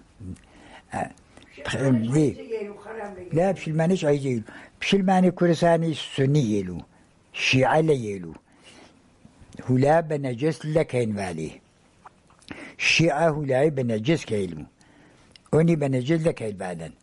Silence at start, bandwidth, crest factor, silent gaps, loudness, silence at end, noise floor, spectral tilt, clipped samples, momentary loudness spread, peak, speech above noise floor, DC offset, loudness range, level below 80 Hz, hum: 0.2 s; 11.5 kHz; 16 dB; none; -23 LUFS; 0.1 s; -54 dBFS; -6 dB/octave; under 0.1%; 17 LU; -8 dBFS; 32 dB; under 0.1%; 4 LU; -54 dBFS; none